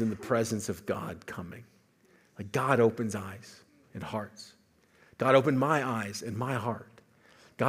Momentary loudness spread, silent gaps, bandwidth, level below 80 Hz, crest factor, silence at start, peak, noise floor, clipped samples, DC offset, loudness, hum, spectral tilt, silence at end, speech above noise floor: 22 LU; none; 16 kHz; -72 dBFS; 24 dB; 0 s; -8 dBFS; -64 dBFS; under 0.1%; under 0.1%; -30 LUFS; none; -6 dB/octave; 0 s; 34 dB